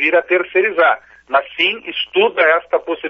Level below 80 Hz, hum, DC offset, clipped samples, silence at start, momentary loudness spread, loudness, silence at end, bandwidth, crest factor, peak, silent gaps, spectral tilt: -62 dBFS; none; under 0.1%; under 0.1%; 0 s; 6 LU; -15 LUFS; 0 s; 6 kHz; 14 dB; -2 dBFS; none; 1 dB/octave